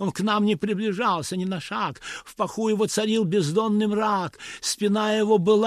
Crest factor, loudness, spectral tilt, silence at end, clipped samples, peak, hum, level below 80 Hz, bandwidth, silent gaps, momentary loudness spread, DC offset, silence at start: 14 dB; -24 LUFS; -5 dB/octave; 0 s; under 0.1%; -8 dBFS; none; -62 dBFS; 14 kHz; none; 8 LU; under 0.1%; 0 s